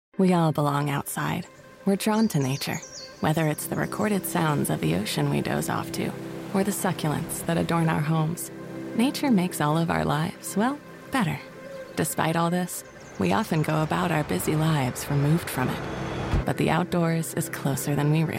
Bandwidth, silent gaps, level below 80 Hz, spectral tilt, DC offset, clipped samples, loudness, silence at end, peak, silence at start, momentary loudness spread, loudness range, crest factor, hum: 16.5 kHz; none; -46 dBFS; -5.5 dB/octave; under 0.1%; under 0.1%; -26 LUFS; 0 s; -10 dBFS; 0.2 s; 8 LU; 2 LU; 16 dB; none